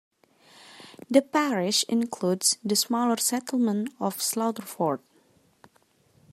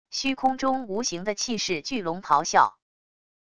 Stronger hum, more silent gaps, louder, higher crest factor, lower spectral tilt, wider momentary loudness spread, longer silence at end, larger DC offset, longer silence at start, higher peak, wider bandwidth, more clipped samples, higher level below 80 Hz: neither; neither; about the same, -25 LUFS vs -25 LUFS; about the same, 22 dB vs 22 dB; about the same, -3 dB/octave vs -2.5 dB/octave; about the same, 8 LU vs 7 LU; first, 1.35 s vs 0.65 s; second, under 0.1% vs 0.4%; first, 0.7 s vs 0.05 s; about the same, -6 dBFS vs -4 dBFS; first, 16 kHz vs 11 kHz; neither; second, -78 dBFS vs -60 dBFS